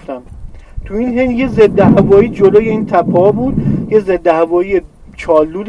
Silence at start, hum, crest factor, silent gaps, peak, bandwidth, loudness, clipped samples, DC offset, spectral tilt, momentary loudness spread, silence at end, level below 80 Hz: 0 s; none; 12 dB; none; 0 dBFS; 8.4 kHz; -11 LUFS; under 0.1%; under 0.1%; -9 dB/octave; 11 LU; 0 s; -32 dBFS